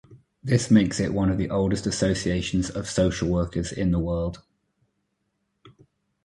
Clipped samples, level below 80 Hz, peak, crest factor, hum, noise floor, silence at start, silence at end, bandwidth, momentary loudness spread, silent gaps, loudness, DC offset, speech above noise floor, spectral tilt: under 0.1%; -40 dBFS; -6 dBFS; 18 dB; none; -75 dBFS; 0.1 s; 0.55 s; 11.5 kHz; 9 LU; none; -24 LUFS; under 0.1%; 52 dB; -6 dB/octave